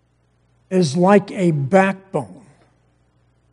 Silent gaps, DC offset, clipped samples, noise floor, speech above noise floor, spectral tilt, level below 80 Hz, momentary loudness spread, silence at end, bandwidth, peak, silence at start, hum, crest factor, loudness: none; under 0.1%; under 0.1%; -61 dBFS; 44 dB; -7 dB/octave; -64 dBFS; 13 LU; 1.2 s; 10.5 kHz; 0 dBFS; 0.7 s; none; 20 dB; -17 LUFS